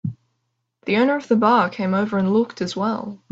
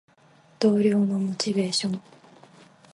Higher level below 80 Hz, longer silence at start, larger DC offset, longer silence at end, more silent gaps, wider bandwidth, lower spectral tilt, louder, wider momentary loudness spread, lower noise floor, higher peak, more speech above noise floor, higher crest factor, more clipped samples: first, -64 dBFS vs -70 dBFS; second, 0.05 s vs 0.6 s; neither; second, 0.15 s vs 0.95 s; neither; second, 7.8 kHz vs 11.5 kHz; first, -7 dB/octave vs -5.5 dB/octave; first, -20 LUFS vs -24 LUFS; first, 10 LU vs 7 LU; first, -74 dBFS vs -57 dBFS; first, -4 dBFS vs -8 dBFS; first, 55 dB vs 34 dB; about the same, 18 dB vs 18 dB; neither